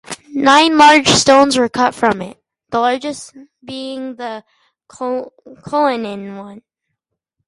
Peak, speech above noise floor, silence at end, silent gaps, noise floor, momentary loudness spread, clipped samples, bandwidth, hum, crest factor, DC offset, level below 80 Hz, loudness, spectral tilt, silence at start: 0 dBFS; 61 dB; 0.9 s; none; -76 dBFS; 22 LU; under 0.1%; 11.5 kHz; none; 16 dB; under 0.1%; -52 dBFS; -13 LUFS; -3 dB/octave; 0.1 s